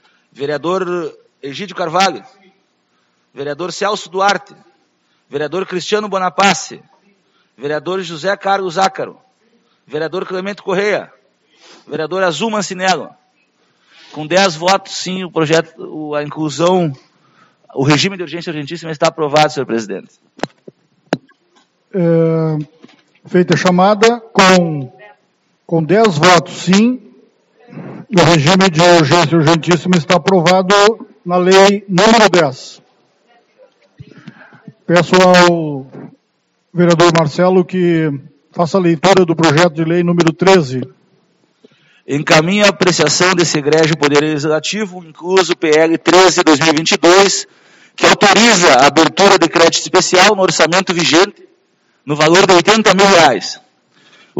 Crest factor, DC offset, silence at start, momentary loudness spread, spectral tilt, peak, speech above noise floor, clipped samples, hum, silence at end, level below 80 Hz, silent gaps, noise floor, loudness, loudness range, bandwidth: 14 dB; under 0.1%; 0.4 s; 17 LU; -4 dB/octave; 0 dBFS; 51 dB; 0.2%; none; 0 s; -54 dBFS; none; -63 dBFS; -12 LUFS; 10 LU; 14 kHz